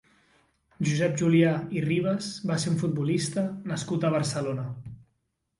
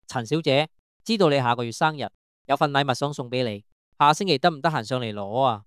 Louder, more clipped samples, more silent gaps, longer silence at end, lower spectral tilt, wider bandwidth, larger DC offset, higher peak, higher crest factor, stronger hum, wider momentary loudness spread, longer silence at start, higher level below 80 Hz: second, -27 LUFS vs -23 LUFS; neither; second, none vs 0.79-1.00 s, 2.15-2.45 s, 3.72-3.92 s; first, 0.6 s vs 0.05 s; about the same, -6 dB/octave vs -5 dB/octave; second, 11.5 kHz vs 15 kHz; neither; second, -10 dBFS vs -4 dBFS; about the same, 16 dB vs 20 dB; neither; about the same, 10 LU vs 10 LU; first, 0.8 s vs 0.1 s; first, -62 dBFS vs -68 dBFS